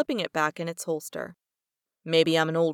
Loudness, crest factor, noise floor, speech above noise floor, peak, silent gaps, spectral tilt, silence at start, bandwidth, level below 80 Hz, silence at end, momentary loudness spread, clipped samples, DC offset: -26 LUFS; 18 dB; -89 dBFS; 63 dB; -10 dBFS; none; -4.5 dB/octave; 0 s; 17.5 kHz; -74 dBFS; 0 s; 16 LU; under 0.1%; under 0.1%